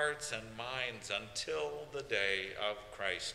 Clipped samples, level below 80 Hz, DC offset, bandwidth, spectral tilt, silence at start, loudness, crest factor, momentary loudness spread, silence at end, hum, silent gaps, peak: under 0.1%; -64 dBFS; under 0.1%; 15.5 kHz; -2 dB/octave; 0 s; -38 LUFS; 20 dB; 7 LU; 0 s; none; none; -20 dBFS